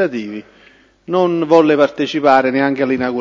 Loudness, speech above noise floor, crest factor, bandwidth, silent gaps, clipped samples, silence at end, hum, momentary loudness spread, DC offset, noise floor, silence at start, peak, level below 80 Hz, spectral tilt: -14 LUFS; 34 dB; 14 dB; 7.6 kHz; none; under 0.1%; 0 s; none; 12 LU; under 0.1%; -48 dBFS; 0 s; 0 dBFS; -56 dBFS; -6.5 dB/octave